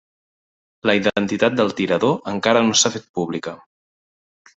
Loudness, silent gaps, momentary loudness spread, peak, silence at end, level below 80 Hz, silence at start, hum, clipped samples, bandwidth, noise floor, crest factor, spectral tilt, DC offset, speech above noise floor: -19 LUFS; 3.09-3.14 s; 11 LU; -2 dBFS; 1 s; -60 dBFS; 0.85 s; none; under 0.1%; 8.4 kHz; under -90 dBFS; 20 dB; -3.5 dB/octave; under 0.1%; over 71 dB